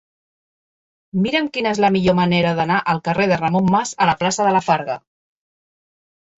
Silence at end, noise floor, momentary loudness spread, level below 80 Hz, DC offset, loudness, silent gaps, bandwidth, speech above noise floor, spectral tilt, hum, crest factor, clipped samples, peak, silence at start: 1.4 s; under -90 dBFS; 5 LU; -52 dBFS; under 0.1%; -18 LUFS; none; 8 kHz; over 73 dB; -5.5 dB/octave; none; 16 dB; under 0.1%; -2 dBFS; 1.15 s